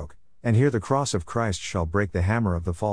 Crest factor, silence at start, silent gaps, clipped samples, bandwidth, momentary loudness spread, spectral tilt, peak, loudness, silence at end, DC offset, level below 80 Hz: 16 dB; 0 s; none; under 0.1%; 10.5 kHz; 6 LU; -6 dB/octave; -8 dBFS; -25 LUFS; 0 s; 0.4%; -42 dBFS